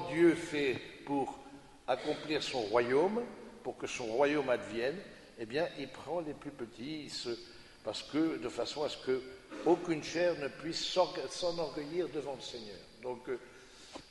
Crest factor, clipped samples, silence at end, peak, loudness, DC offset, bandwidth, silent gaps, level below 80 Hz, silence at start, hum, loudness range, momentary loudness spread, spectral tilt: 20 dB; under 0.1%; 0 s; -16 dBFS; -35 LUFS; under 0.1%; 11.5 kHz; none; -66 dBFS; 0 s; none; 5 LU; 15 LU; -4.5 dB/octave